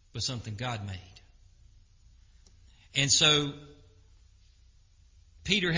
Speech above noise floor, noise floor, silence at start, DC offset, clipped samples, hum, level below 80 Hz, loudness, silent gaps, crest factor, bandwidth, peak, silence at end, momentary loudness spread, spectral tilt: 31 dB; -60 dBFS; 0.15 s; under 0.1%; under 0.1%; none; -54 dBFS; -26 LUFS; none; 24 dB; 7.8 kHz; -10 dBFS; 0 s; 22 LU; -2.5 dB/octave